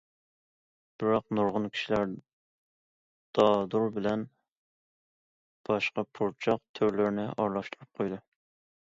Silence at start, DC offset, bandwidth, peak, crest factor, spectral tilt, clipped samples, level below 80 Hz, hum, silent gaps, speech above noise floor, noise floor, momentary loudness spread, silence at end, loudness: 1 s; under 0.1%; 7.6 kHz; -10 dBFS; 22 dB; -6.5 dB/octave; under 0.1%; -66 dBFS; none; 2.33-3.33 s, 4.52-5.64 s, 6.69-6.74 s; over 61 dB; under -90 dBFS; 10 LU; 0.6 s; -30 LUFS